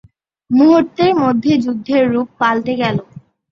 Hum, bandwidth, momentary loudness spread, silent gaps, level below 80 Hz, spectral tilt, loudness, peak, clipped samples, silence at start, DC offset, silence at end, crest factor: none; 7 kHz; 7 LU; none; -54 dBFS; -7 dB/octave; -14 LUFS; -2 dBFS; under 0.1%; 0.5 s; under 0.1%; 0.3 s; 12 dB